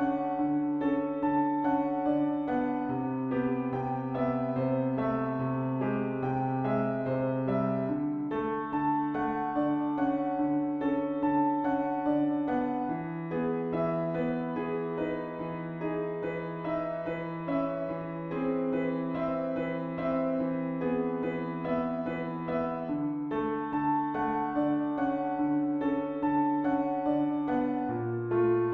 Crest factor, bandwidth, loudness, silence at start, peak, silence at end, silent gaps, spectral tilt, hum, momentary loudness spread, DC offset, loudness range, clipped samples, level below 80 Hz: 14 dB; 4.3 kHz; -31 LUFS; 0 s; -16 dBFS; 0 s; none; -10.5 dB/octave; none; 5 LU; under 0.1%; 3 LU; under 0.1%; -60 dBFS